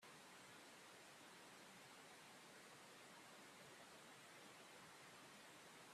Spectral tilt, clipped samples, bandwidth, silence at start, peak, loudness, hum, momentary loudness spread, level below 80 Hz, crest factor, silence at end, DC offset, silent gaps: -2 dB/octave; under 0.1%; 14.5 kHz; 0 s; -50 dBFS; -62 LUFS; none; 0 LU; under -90 dBFS; 14 dB; 0 s; under 0.1%; none